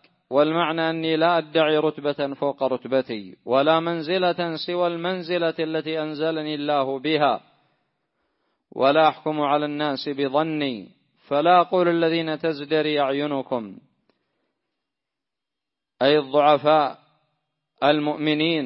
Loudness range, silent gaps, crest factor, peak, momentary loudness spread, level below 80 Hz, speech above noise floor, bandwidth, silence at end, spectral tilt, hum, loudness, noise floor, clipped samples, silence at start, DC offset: 4 LU; none; 18 dB; -4 dBFS; 9 LU; -74 dBFS; 65 dB; 5.8 kHz; 0 s; -10 dB/octave; none; -22 LUFS; -86 dBFS; under 0.1%; 0.3 s; under 0.1%